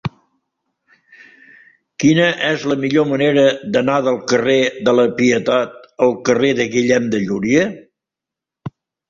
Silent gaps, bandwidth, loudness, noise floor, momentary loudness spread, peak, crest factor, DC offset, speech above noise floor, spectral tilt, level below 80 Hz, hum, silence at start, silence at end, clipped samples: none; 7.6 kHz; -16 LUFS; -85 dBFS; 11 LU; -2 dBFS; 16 dB; under 0.1%; 70 dB; -5 dB/octave; -54 dBFS; none; 0.05 s; 0.4 s; under 0.1%